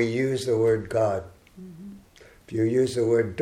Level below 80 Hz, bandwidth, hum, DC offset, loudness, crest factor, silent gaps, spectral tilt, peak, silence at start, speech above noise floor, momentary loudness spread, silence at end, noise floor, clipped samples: -56 dBFS; 14.5 kHz; none; under 0.1%; -24 LUFS; 14 dB; none; -6.5 dB/octave; -12 dBFS; 0 s; 29 dB; 21 LU; 0 s; -52 dBFS; under 0.1%